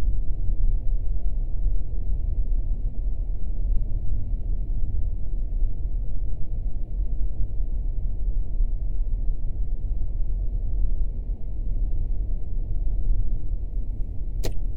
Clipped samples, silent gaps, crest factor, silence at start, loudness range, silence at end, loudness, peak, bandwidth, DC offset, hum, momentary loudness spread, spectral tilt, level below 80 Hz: under 0.1%; none; 12 dB; 0 s; 1 LU; 0 s; -32 LUFS; -8 dBFS; 4.4 kHz; under 0.1%; none; 4 LU; -8 dB/octave; -24 dBFS